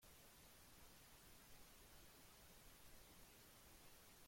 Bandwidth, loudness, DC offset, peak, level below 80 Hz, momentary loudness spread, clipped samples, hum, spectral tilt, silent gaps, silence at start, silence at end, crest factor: 16.5 kHz; -65 LUFS; under 0.1%; -52 dBFS; -74 dBFS; 0 LU; under 0.1%; none; -2.5 dB/octave; none; 0 s; 0 s; 14 dB